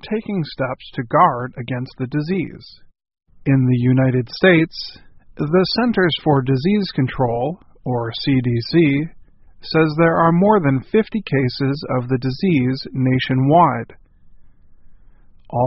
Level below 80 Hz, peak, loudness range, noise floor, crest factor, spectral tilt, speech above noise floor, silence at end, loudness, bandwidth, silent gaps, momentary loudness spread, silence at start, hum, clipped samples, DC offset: -46 dBFS; 0 dBFS; 3 LU; -45 dBFS; 18 dB; -5.5 dB/octave; 27 dB; 0 s; -18 LUFS; 5.8 kHz; none; 12 LU; 0.05 s; none; under 0.1%; under 0.1%